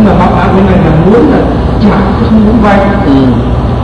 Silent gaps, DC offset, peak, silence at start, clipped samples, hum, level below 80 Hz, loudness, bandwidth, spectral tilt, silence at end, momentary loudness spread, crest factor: none; under 0.1%; 0 dBFS; 0 s; 0.2%; none; -16 dBFS; -6 LUFS; 9 kHz; -9 dB/octave; 0 s; 3 LU; 6 dB